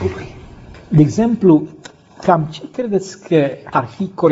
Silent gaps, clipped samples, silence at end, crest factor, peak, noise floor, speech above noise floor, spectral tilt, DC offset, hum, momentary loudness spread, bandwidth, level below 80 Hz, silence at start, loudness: none; under 0.1%; 0 s; 16 dB; 0 dBFS; -37 dBFS; 23 dB; -7.5 dB/octave; under 0.1%; none; 12 LU; 8 kHz; -46 dBFS; 0 s; -16 LUFS